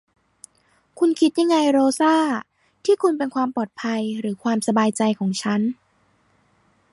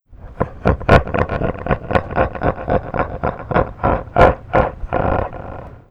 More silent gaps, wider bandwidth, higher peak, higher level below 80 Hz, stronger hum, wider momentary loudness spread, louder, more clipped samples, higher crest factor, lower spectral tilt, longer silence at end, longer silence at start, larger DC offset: neither; first, 11.5 kHz vs 9.6 kHz; second, -6 dBFS vs 0 dBFS; second, -70 dBFS vs -28 dBFS; neither; about the same, 9 LU vs 11 LU; second, -21 LUFS vs -18 LUFS; neither; about the same, 16 dB vs 18 dB; second, -5 dB/octave vs -8.5 dB/octave; first, 1.2 s vs 0.1 s; first, 0.95 s vs 0.1 s; neither